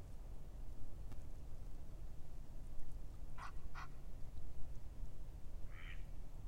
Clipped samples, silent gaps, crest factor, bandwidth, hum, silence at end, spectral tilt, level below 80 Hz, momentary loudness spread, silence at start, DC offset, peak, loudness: under 0.1%; none; 14 dB; 8.4 kHz; none; 0 s; -6 dB/octave; -50 dBFS; 3 LU; 0 s; under 0.1%; -28 dBFS; -56 LUFS